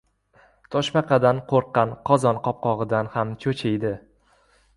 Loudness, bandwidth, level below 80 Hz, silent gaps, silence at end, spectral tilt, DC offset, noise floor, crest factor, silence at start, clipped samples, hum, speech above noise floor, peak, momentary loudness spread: -23 LUFS; 11.5 kHz; -56 dBFS; none; 0.8 s; -6.5 dB/octave; under 0.1%; -60 dBFS; 20 dB; 0.7 s; under 0.1%; none; 38 dB; -4 dBFS; 8 LU